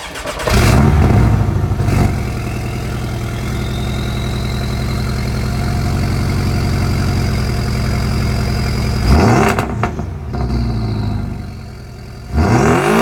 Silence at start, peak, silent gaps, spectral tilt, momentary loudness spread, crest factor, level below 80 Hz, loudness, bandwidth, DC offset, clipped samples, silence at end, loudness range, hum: 0 s; 0 dBFS; none; -6.5 dB/octave; 10 LU; 14 dB; -22 dBFS; -16 LUFS; 18.5 kHz; under 0.1%; under 0.1%; 0 s; 5 LU; none